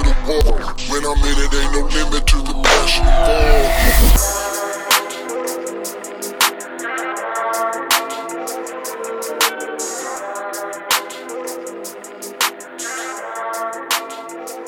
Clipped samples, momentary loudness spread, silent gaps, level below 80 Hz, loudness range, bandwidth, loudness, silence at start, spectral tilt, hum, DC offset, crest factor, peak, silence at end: under 0.1%; 13 LU; none; -20 dBFS; 8 LU; over 20 kHz; -19 LUFS; 0 s; -3 dB/octave; none; under 0.1%; 16 dB; 0 dBFS; 0 s